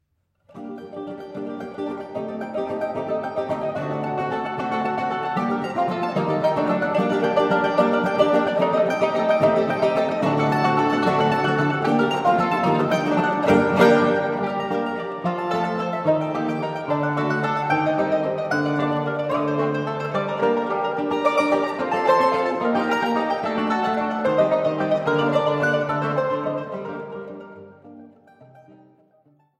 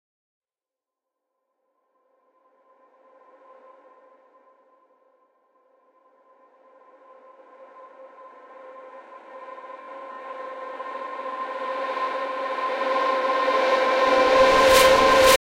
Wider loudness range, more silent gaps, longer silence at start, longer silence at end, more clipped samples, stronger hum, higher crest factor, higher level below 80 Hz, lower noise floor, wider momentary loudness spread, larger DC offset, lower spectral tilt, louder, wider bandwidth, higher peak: second, 7 LU vs 27 LU; neither; second, 0.55 s vs 7.75 s; first, 1 s vs 0.15 s; neither; neither; about the same, 20 dB vs 20 dB; second, -62 dBFS vs -52 dBFS; second, -62 dBFS vs under -90 dBFS; second, 11 LU vs 27 LU; neither; first, -7 dB/octave vs -2 dB/octave; about the same, -22 LUFS vs -20 LUFS; second, 14 kHz vs 16 kHz; first, -2 dBFS vs -6 dBFS